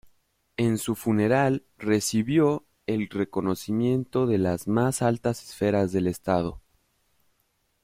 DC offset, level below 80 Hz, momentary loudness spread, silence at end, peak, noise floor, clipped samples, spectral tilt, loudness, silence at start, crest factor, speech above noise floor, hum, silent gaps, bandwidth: under 0.1%; -56 dBFS; 7 LU; 1.25 s; -10 dBFS; -71 dBFS; under 0.1%; -6 dB/octave; -26 LUFS; 0.6 s; 16 dB; 47 dB; none; none; 16 kHz